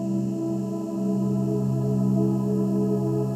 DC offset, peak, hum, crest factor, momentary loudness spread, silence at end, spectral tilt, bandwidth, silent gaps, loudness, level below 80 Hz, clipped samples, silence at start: under 0.1%; -12 dBFS; none; 12 dB; 5 LU; 0 s; -10 dB/octave; 13.5 kHz; none; -25 LUFS; -60 dBFS; under 0.1%; 0 s